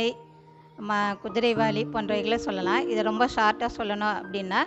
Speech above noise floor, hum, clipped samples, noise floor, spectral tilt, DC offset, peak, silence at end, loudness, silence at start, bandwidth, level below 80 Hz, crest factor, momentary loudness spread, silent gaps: 26 dB; none; under 0.1%; -52 dBFS; -5 dB/octave; under 0.1%; -8 dBFS; 0 s; -26 LUFS; 0 s; 8.4 kHz; -56 dBFS; 18 dB; 6 LU; none